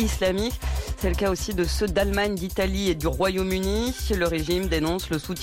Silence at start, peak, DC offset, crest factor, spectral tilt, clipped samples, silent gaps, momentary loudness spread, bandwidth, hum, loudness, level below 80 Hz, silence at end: 0 s; -12 dBFS; under 0.1%; 12 dB; -5 dB/octave; under 0.1%; none; 4 LU; 17 kHz; none; -25 LUFS; -32 dBFS; 0 s